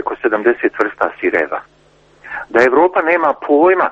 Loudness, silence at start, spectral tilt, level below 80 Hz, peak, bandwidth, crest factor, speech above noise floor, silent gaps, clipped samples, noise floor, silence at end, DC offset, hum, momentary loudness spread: -14 LUFS; 0 s; -6 dB/octave; -54 dBFS; 0 dBFS; 7.8 kHz; 14 dB; 36 dB; none; under 0.1%; -50 dBFS; 0 s; under 0.1%; none; 10 LU